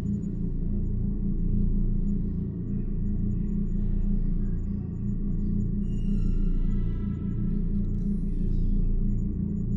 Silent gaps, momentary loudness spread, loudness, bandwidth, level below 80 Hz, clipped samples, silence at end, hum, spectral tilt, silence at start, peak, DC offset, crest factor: none; 3 LU; -30 LUFS; 2.1 kHz; -28 dBFS; under 0.1%; 0 s; none; -11.5 dB/octave; 0 s; -14 dBFS; under 0.1%; 12 dB